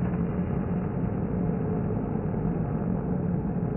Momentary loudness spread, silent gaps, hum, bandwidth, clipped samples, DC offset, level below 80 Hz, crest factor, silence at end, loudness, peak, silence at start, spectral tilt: 1 LU; none; none; 3 kHz; under 0.1%; under 0.1%; -40 dBFS; 12 dB; 0 s; -29 LUFS; -16 dBFS; 0 s; -9 dB/octave